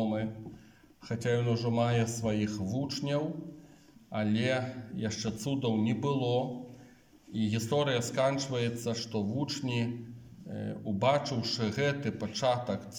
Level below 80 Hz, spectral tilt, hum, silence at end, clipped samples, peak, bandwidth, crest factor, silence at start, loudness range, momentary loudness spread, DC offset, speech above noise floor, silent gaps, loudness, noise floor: -66 dBFS; -5.5 dB/octave; none; 0 s; under 0.1%; -16 dBFS; 17 kHz; 16 dB; 0 s; 2 LU; 11 LU; under 0.1%; 26 dB; none; -32 LUFS; -57 dBFS